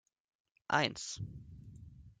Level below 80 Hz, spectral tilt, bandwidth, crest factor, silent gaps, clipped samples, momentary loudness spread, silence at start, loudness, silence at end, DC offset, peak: -64 dBFS; -3.5 dB/octave; 9.6 kHz; 26 dB; none; under 0.1%; 23 LU; 0.7 s; -36 LUFS; 0.1 s; under 0.1%; -16 dBFS